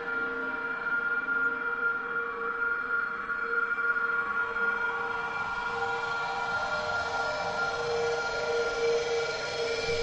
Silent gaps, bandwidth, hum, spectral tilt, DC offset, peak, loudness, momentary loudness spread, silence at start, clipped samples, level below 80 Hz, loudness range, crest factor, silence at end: none; 9.2 kHz; none; -3 dB/octave; under 0.1%; -18 dBFS; -30 LUFS; 4 LU; 0 s; under 0.1%; -58 dBFS; 1 LU; 12 dB; 0 s